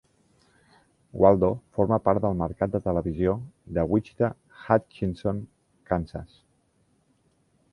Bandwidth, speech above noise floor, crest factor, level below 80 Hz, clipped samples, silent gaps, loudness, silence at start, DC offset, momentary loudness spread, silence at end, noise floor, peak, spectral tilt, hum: 11 kHz; 42 dB; 24 dB; -46 dBFS; under 0.1%; none; -26 LUFS; 1.15 s; under 0.1%; 14 LU; 1.45 s; -67 dBFS; -4 dBFS; -10 dB/octave; none